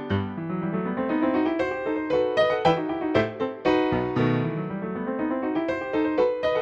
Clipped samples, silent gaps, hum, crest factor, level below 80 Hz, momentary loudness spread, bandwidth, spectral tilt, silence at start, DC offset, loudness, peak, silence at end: under 0.1%; none; none; 18 dB; -54 dBFS; 6 LU; 7.4 kHz; -7.5 dB/octave; 0 s; under 0.1%; -25 LUFS; -6 dBFS; 0 s